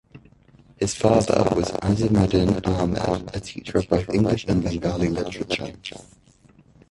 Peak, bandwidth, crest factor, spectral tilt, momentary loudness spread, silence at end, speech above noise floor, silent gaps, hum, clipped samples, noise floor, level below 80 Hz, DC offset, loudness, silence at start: -2 dBFS; 11.5 kHz; 20 dB; -6.5 dB/octave; 9 LU; 0.9 s; 32 dB; none; none; under 0.1%; -54 dBFS; -40 dBFS; under 0.1%; -22 LUFS; 0.15 s